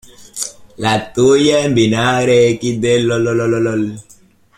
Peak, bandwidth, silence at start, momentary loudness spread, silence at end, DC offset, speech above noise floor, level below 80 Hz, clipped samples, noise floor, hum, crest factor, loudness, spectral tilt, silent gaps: -2 dBFS; 15.5 kHz; 0.2 s; 13 LU; 0.55 s; under 0.1%; 33 dB; -48 dBFS; under 0.1%; -47 dBFS; none; 14 dB; -14 LUFS; -5 dB/octave; none